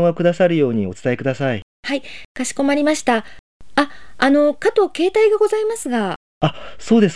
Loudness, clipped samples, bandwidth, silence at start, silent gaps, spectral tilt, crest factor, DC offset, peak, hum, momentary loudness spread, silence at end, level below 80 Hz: -18 LUFS; under 0.1%; 11 kHz; 0 s; 1.62-1.83 s, 2.25-2.35 s, 3.39-3.60 s, 6.16-6.41 s; -5.5 dB/octave; 16 dB; 1%; -2 dBFS; none; 10 LU; 0 s; -54 dBFS